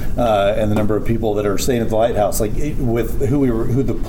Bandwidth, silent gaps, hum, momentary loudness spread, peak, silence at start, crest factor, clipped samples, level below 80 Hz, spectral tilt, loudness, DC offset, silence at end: 18.5 kHz; none; none; 4 LU; -6 dBFS; 0 s; 10 dB; under 0.1%; -24 dBFS; -6.5 dB/octave; -18 LUFS; under 0.1%; 0 s